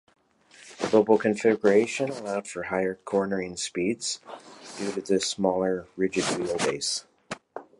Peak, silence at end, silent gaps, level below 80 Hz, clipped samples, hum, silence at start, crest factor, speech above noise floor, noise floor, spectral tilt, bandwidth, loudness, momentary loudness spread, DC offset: -8 dBFS; 0.2 s; none; -64 dBFS; under 0.1%; none; 0.6 s; 20 dB; 29 dB; -55 dBFS; -4 dB/octave; 11.5 kHz; -26 LUFS; 15 LU; under 0.1%